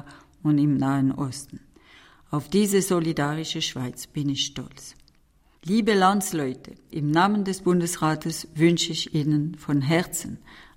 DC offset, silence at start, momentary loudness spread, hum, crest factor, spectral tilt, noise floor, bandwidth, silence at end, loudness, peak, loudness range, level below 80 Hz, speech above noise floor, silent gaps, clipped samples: under 0.1%; 0.05 s; 16 LU; none; 18 dB; -5 dB/octave; -60 dBFS; 16 kHz; 0.15 s; -24 LUFS; -6 dBFS; 3 LU; -56 dBFS; 36 dB; none; under 0.1%